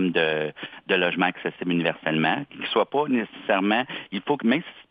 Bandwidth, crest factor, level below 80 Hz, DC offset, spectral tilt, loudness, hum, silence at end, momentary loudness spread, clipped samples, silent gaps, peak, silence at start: 5 kHz; 18 dB; -72 dBFS; under 0.1%; -8.5 dB/octave; -24 LUFS; none; 0.1 s; 7 LU; under 0.1%; none; -6 dBFS; 0 s